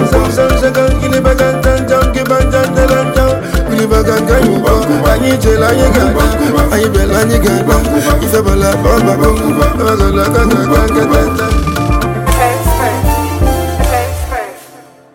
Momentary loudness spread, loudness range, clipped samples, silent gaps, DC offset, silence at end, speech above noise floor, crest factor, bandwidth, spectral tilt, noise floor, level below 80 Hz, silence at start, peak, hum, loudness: 4 LU; 2 LU; under 0.1%; none; under 0.1%; 0.35 s; 28 dB; 10 dB; 17 kHz; -6 dB/octave; -37 dBFS; -16 dBFS; 0 s; 0 dBFS; none; -11 LUFS